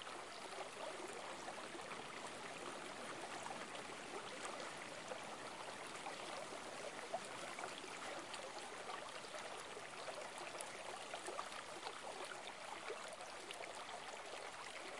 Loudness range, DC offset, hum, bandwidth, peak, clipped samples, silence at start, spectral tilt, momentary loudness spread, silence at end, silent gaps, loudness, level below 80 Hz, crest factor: 1 LU; under 0.1%; none; 11.5 kHz; -26 dBFS; under 0.1%; 0 s; -1.5 dB/octave; 2 LU; 0 s; none; -49 LUFS; -86 dBFS; 24 dB